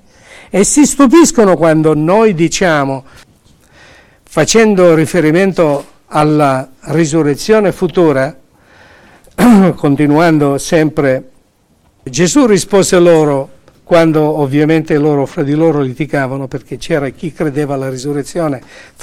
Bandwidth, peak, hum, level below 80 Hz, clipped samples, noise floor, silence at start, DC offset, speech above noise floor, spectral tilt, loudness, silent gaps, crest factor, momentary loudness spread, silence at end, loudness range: 16 kHz; 0 dBFS; none; -40 dBFS; under 0.1%; -52 dBFS; 0.55 s; under 0.1%; 42 dB; -5.5 dB/octave; -11 LUFS; none; 12 dB; 11 LU; 0.45 s; 4 LU